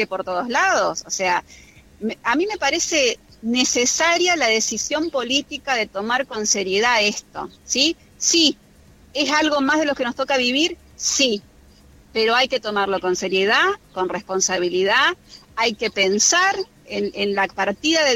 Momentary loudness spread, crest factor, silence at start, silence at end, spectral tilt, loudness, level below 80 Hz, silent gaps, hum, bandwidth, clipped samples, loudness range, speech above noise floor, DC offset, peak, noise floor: 9 LU; 18 dB; 0 s; 0 s; -1.5 dB/octave; -19 LUFS; -54 dBFS; none; none; 16.5 kHz; under 0.1%; 2 LU; 29 dB; under 0.1%; -2 dBFS; -49 dBFS